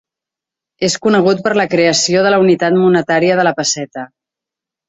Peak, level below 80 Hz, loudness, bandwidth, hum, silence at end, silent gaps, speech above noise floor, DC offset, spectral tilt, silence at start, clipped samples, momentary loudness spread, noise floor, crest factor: -2 dBFS; -56 dBFS; -13 LUFS; 8.2 kHz; none; 0.8 s; none; 73 dB; under 0.1%; -4 dB/octave; 0.8 s; under 0.1%; 9 LU; -85 dBFS; 12 dB